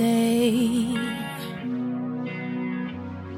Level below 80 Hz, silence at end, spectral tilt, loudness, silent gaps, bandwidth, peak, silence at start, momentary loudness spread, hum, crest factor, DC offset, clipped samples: -58 dBFS; 0 s; -5.5 dB/octave; -26 LUFS; none; 16 kHz; -10 dBFS; 0 s; 11 LU; none; 16 dB; under 0.1%; under 0.1%